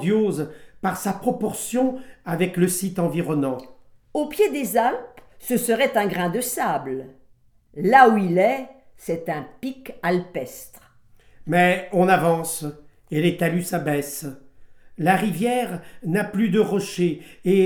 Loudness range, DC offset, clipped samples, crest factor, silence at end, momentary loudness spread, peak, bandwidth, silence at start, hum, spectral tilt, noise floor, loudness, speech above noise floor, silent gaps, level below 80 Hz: 4 LU; under 0.1%; under 0.1%; 22 dB; 0 s; 15 LU; 0 dBFS; 19.5 kHz; 0 s; none; -5.5 dB/octave; -55 dBFS; -22 LUFS; 34 dB; none; -58 dBFS